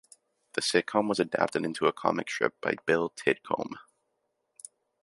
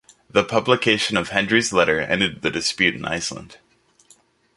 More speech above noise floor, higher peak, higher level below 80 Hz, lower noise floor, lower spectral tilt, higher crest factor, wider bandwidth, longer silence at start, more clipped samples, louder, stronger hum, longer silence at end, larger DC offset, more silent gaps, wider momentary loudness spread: first, 50 dB vs 36 dB; second, -6 dBFS vs -2 dBFS; second, -72 dBFS vs -52 dBFS; first, -79 dBFS vs -56 dBFS; about the same, -4 dB/octave vs -3.5 dB/octave; about the same, 24 dB vs 20 dB; about the same, 11.5 kHz vs 11.5 kHz; first, 0.55 s vs 0.35 s; neither; second, -29 LUFS vs -20 LUFS; neither; first, 1.2 s vs 1 s; neither; neither; first, 20 LU vs 8 LU